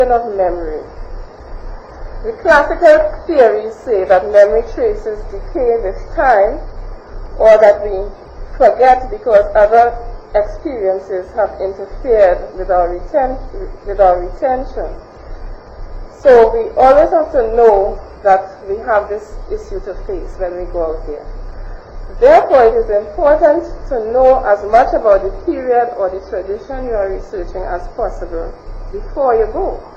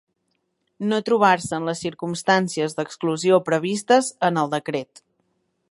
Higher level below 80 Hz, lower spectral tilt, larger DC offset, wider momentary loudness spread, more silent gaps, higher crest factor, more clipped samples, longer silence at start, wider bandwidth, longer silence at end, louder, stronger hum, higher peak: first, -28 dBFS vs -66 dBFS; first, -6.5 dB/octave vs -4.5 dB/octave; neither; first, 23 LU vs 10 LU; neither; second, 14 dB vs 20 dB; neither; second, 0 s vs 0.8 s; second, 7.8 kHz vs 11.5 kHz; second, 0 s vs 0.85 s; first, -13 LUFS vs -21 LUFS; neither; about the same, 0 dBFS vs -2 dBFS